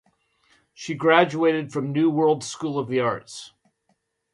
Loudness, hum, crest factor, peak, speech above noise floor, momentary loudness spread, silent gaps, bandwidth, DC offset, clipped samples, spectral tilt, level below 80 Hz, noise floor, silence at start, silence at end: -22 LUFS; none; 22 dB; -2 dBFS; 49 dB; 16 LU; none; 11.5 kHz; under 0.1%; under 0.1%; -5.5 dB/octave; -68 dBFS; -71 dBFS; 0.8 s; 0.85 s